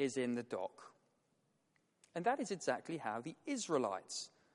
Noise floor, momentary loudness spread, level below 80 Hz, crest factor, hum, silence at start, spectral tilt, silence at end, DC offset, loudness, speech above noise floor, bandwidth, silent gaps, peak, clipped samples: -80 dBFS; 8 LU; -88 dBFS; 20 dB; none; 0 s; -4 dB/octave; 0.25 s; under 0.1%; -41 LUFS; 39 dB; 11.5 kHz; none; -22 dBFS; under 0.1%